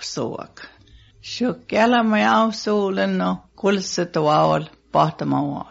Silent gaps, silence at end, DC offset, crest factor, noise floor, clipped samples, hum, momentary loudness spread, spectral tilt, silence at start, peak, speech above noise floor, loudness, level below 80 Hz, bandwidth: none; 0.05 s; under 0.1%; 18 dB; -50 dBFS; under 0.1%; none; 11 LU; -4.5 dB/octave; 0 s; -4 dBFS; 30 dB; -20 LUFS; -56 dBFS; 8 kHz